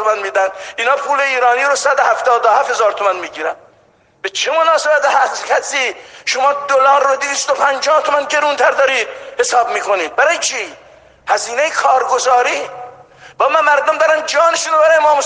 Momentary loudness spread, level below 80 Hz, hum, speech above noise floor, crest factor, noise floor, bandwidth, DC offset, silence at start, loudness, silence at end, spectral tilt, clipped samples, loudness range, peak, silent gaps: 9 LU; -64 dBFS; none; 38 dB; 14 dB; -52 dBFS; 10 kHz; under 0.1%; 0 s; -14 LUFS; 0 s; 0.5 dB/octave; under 0.1%; 2 LU; 0 dBFS; none